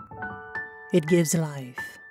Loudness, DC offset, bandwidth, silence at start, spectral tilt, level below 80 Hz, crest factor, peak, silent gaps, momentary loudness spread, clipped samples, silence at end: -26 LUFS; under 0.1%; 16.5 kHz; 0 s; -5.5 dB/octave; -62 dBFS; 18 dB; -10 dBFS; none; 15 LU; under 0.1%; 0 s